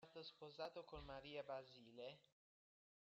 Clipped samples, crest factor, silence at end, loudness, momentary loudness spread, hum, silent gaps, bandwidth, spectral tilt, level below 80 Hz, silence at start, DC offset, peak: under 0.1%; 18 dB; 0.95 s; -56 LUFS; 6 LU; none; none; 7.6 kHz; -2.5 dB/octave; -74 dBFS; 0 s; under 0.1%; -38 dBFS